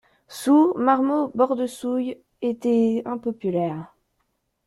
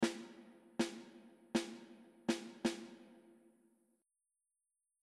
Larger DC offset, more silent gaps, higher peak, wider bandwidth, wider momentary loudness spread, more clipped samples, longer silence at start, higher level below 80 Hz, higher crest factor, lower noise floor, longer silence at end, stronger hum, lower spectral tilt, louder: neither; neither; first, -4 dBFS vs -22 dBFS; about the same, 14 kHz vs 13.5 kHz; second, 11 LU vs 19 LU; neither; first, 0.3 s vs 0 s; first, -66 dBFS vs -80 dBFS; about the same, 18 dB vs 22 dB; second, -73 dBFS vs under -90 dBFS; second, 0.8 s vs 1.85 s; neither; first, -6.5 dB/octave vs -4 dB/octave; first, -22 LUFS vs -42 LUFS